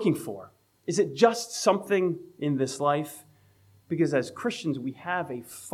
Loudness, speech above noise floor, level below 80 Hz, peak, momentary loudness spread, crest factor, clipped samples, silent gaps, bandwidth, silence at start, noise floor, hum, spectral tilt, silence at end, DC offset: -27 LUFS; 33 dB; -76 dBFS; -6 dBFS; 15 LU; 22 dB; under 0.1%; none; 16 kHz; 0 s; -60 dBFS; none; -5 dB/octave; 0 s; under 0.1%